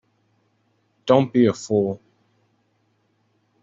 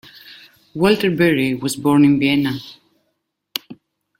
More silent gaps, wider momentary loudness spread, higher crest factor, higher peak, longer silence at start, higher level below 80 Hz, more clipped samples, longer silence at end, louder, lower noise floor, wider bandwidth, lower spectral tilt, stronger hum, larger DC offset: neither; about the same, 15 LU vs 15 LU; about the same, 22 dB vs 20 dB; about the same, -2 dBFS vs 0 dBFS; first, 1.05 s vs 0.3 s; second, -64 dBFS vs -56 dBFS; neither; first, 1.65 s vs 0.45 s; second, -20 LUFS vs -17 LUFS; second, -67 dBFS vs -72 dBFS; second, 7.8 kHz vs 16.5 kHz; about the same, -6.5 dB/octave vs -5.5 dB/octave; neither; neither